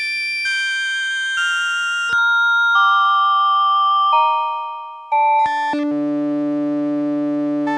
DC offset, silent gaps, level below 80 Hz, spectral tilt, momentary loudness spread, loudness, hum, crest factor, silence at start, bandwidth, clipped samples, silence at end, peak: under 0.1%; none; -70 dBFS; -2.5 dB/octave; 7 LU; -17 LUFS; none; 12 dB; 0 s; 11.5 kHz; under 0.1%; 0 s; -6 dBFS